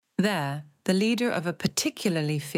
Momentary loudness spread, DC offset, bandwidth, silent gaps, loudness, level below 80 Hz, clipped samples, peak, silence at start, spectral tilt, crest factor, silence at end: 5 LU; under 0.1%; 16.5 kHz; none; -27 LUFS; -68 dBFS; under 0.1%; -8 dBFS; 0.2 s; -4.5 dB/octave; 20 dB; 0 s